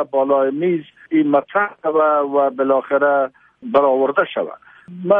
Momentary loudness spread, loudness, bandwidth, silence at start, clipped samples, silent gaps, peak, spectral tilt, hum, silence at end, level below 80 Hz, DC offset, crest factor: 9 LU; -17 LUFS; 3.8 kHz; 0 s; under 0.1%; none; -2 dBFS; -9.5 dB/octave; none; 0 s; -68 dBFS; under 0.1%; 16 dB